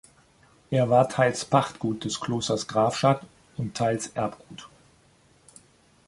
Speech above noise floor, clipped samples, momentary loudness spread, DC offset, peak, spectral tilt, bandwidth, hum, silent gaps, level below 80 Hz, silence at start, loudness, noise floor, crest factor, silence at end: 35 dB; under 0.1%; 14 LU; under 0.1%; -4 dBFS; -5 dB/octave; 11.5 kHz; none; none; -60 dBFS; 0.7 s; -25 LUFS; -60 dBFS; 22 dB; 1.4 s